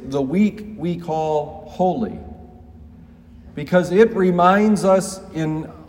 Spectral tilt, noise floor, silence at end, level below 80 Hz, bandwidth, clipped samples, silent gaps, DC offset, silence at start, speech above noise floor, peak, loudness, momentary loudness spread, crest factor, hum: -6.5 dB/octave; -43 dBFS; 0.05 s; -48 dBFS; 16 kHz; under 0.1%; none; under 0.1%; 0 s; 25 dB; 0 dBFS; -19 LUFS; 16 LU; 18 dB; none